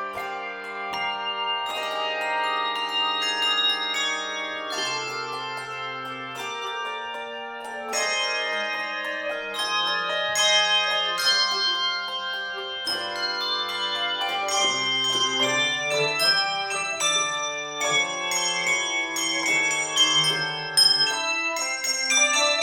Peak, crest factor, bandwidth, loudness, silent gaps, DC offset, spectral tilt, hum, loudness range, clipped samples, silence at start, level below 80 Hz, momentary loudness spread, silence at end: -6 dBFS; 20 dB; 19.5 kHz; -23 LUFS; none; under 0.1%; 0 dB/octave; none; 7 LU; under 0.1%; 0 s; -68 dBFS; 12 LU; 0 s